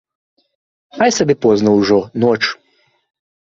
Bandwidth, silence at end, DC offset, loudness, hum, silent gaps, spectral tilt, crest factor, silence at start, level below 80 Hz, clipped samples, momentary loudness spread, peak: 7.8 kHz; 0.85 s; under 0.1%; -14 LUFS; none; none; -5 dB/octave; 16 dB; 0.95 s; -54 dBFS; under 0.1%; 6 LU; 0 dBFS